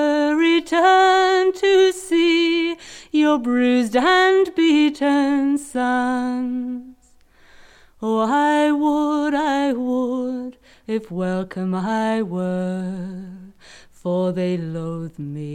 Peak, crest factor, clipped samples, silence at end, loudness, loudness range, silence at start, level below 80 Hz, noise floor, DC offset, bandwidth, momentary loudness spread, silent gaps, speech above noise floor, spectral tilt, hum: -4 dBFS; 14 dB; under 0.1%; 0 s; -19 LUFS; 8 LU; 0 s; -56 dBFS; -53 dBFS; under 0.1%; 13 kHz; 14 LU; none; 33 dB; -5.5 dB/octave; none